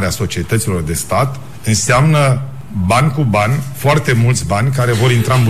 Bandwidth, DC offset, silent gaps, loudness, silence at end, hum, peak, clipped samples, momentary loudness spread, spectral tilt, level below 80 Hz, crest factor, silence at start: 15 kHz; 3%; none; -14 LUFS; 0 s; none; -2 dBFS; under 0.1%; 8 LU; -5.5 dB/octave; -36 dBFS; 12 dB; 0 s